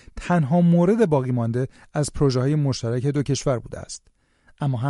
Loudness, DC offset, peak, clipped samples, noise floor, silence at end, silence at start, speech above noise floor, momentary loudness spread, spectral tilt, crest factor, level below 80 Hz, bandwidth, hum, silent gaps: -22 LUFS; under 0.1%; -6 dBFS; under 0.1%; -58 dBFS; 0 s; 0.15 s; 37 dB; 11 LU; -7 dB/octave; 14 dB; -44 dBFS; 11.5 kHz; none; none